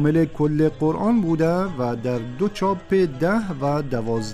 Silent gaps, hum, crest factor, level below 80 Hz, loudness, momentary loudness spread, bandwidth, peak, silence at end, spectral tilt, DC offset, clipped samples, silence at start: none; none; 14 dB; -44 dBFS; -22 LUFS; 5 LU; 13 kHz; -6 dBFS; 0 s; -8 dB/octave; under 0.1%; under 0.1%; 0 s